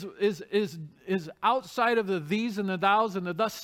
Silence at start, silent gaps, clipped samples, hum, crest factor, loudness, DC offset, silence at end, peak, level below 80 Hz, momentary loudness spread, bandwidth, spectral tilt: 0 s; none; under 0.1%; none; 18 dB; -28 LUFS; under 0.1%; 0 s; -10 dBFS; -72 dBFS; 8 LU; 16.5 kHz; -5.5 dB/octave